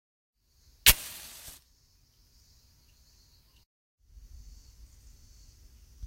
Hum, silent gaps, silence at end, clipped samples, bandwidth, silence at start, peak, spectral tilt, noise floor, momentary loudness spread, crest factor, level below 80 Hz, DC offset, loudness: none; none; 5 s; under 0.1%; 16 kHz; 0.85 s; -2 dBFS; 0 dB/octave; -65 dBFS; 25 LU; 34 dB; -48 dBFS; under 0.1%; -23 LUFS